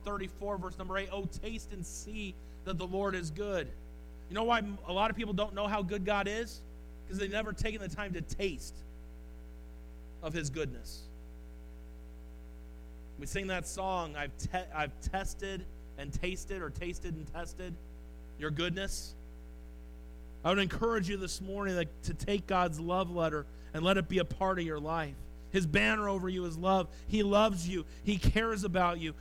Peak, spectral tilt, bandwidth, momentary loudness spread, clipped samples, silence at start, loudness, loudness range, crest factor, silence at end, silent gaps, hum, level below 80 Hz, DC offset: -14 dBFS; -5 dB/octave; 16.5 kHz; 21 LU; under 0.1%; 0 s; -35 LUFS; 10 LU; 20 dB; 0 s; none; none; -44 dBFS; under 0.1%